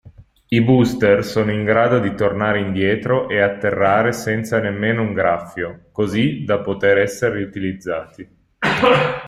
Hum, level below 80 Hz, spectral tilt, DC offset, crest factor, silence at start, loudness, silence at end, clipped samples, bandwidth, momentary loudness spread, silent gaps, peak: none; -50 dBFS; -6.5 dB/octave; under 0.1%; 16 dB; 0.05 s; -18 LUFS; 0 s; under 0.1%; 15.5 kHz; 10 LU; none; -2 dBFS